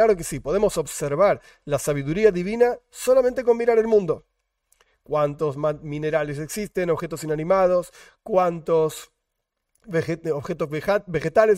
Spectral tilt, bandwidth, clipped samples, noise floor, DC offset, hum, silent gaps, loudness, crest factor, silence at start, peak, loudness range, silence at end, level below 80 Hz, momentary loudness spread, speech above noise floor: -5.5 dB/octave; 16 kHz; under 0.1%; -79 dBFS; under 0.1%; none; none; -23 LUFS; 18 dB; 0 s; -4 dBFS; 4 LU; 0 s; -50 dBFS; 9 LU; 57 dB